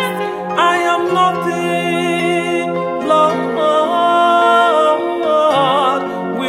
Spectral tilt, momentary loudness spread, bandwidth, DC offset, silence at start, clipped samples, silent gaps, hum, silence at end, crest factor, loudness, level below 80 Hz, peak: -5 dB/octave; 8 LU; 16 kHz; under 0.1%; 0 s; under 0.1%; none; none; 0 s; 14 dB; -14 LUFS; -60 dBFS; 0 dBFS